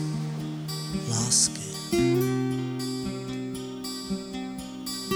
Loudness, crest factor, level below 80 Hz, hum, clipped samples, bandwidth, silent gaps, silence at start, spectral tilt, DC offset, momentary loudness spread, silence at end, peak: -28 LUFS; 20 dB; -54 dBFS; none; under 0.1%; over 20 kHz; none; 0 s; -4 dB/octave; under 0.1%; 13 LU; 0 s; -8 dBFS